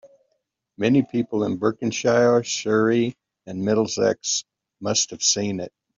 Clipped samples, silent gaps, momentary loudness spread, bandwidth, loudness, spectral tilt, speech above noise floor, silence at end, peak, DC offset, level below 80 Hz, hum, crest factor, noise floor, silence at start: under 0.1%; none; 9 LU; 7.8 kHz; -22 LUFS; -4 dB/octave; 53 dB; 0.3 s; -6 dBFS; under 0.1%; -64 dBFS; none; 18 dB; -74 dBFS; 0.05 s